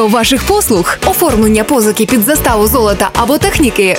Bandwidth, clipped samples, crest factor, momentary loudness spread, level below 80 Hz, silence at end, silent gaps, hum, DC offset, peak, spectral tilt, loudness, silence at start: 16.5 kHz; under 0.1%; 10 dB; 2 LU; -24 dBFS; 0 s; none; none; under 0.1%; 0 dBFS; -4 dB/octave; -10 LUFS; 0 s